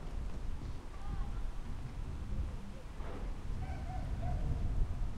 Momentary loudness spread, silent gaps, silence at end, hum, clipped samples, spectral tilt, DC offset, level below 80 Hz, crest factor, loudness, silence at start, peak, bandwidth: 8 LU; none; 0 s; none; under 0.1%; -7 dB/octave; under 0.1%; -40 dBFS; 16 dB; -43 LUFS; 0 s; -20 dBFS; 10.5 kHz